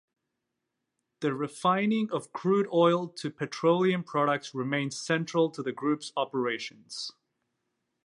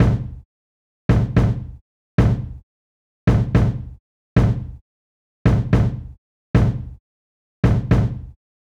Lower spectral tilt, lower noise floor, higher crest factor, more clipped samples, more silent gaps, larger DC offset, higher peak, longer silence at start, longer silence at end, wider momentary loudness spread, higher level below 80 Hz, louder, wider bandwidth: second, -5.5 dB/octave vs -9 dB/octave; second, -84 dBFS vs under -90 dBFS; about the same, 20 dB vs 16 dB; neither; second, none vs 0.45-1.09 s, 1.81-2.18 s, 2.63-3.27 s, 3.99-4.36 s, 4.81-5.45 s, 6.18-6.54 s, 7.00-7.63 s; neither; second, -10 dBFS vs -4 dBFS; first, 1.2 s vs 0 s; first, 0.95 s vs 0.4 s; second, 11 LU vs 17 LU; second, -82 dBFS vs -28 dBFS; second, -29 LUFS vs -20 LUFS; first, 11.5 kHz vs 7.6 kHz